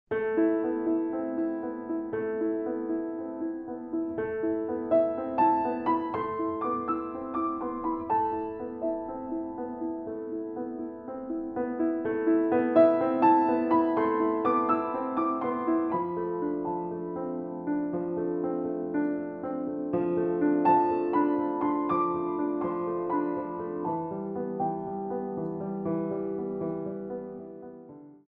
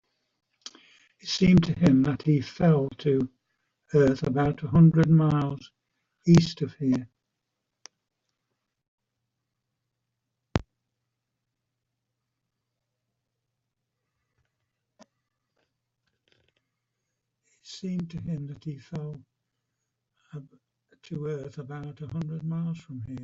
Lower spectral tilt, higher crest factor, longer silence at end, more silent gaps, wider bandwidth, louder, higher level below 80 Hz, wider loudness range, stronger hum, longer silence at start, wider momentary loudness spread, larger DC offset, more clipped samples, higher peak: first, -11 dB/octave vs -7.5 dB/octave; about the same, 20 dB vs 24 dB; about the same, 0.1 s vs 0 s; second, none vs 8.88-8.98 s; second, 4.6 kHz vs 7.4 kHz; second, -29 LUFS vs -25 LUFS; second, -64 dBFS vs -54 dBFS; second, 8 LU vs 18 LU; neither; second, 0.1 s vs 1.25 s; second, 10 LU vs 20 LU; neither; neither; second, -8 dBFS vs -4 dBFS